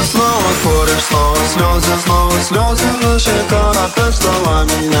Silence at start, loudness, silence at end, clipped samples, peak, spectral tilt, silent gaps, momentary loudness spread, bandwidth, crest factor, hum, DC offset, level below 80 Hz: 0 s; -13 LUFS; 0 s; under 0.1%; 0 dBFS; -4 dB/octave; none; 1 LU; 17 kHz; 12 dB; none; under 0.1%; -18 dBFS